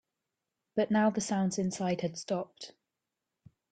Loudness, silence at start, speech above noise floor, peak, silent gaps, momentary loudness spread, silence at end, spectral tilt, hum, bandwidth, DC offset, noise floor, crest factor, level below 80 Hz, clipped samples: -32 LUFS; 0.75 s; 57 dB; -16 dBFS; none; 15 LU; 1.05 s; -5.5 dB/octave; none; 9.4 kHz; under 0.1%; -88 dBFS; 18 dB; -70 dBFS; under 0.1%